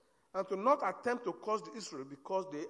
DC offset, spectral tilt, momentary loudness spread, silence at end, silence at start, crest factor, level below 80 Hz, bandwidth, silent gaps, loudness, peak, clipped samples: under 0.1%; -4.5 dB/octave; 13 LU; 0 s; 0.35 s; 20 dB; -86 dBFS; 10.5 kHz; none; -36 LUFS; -16 dBFS; under 0.1%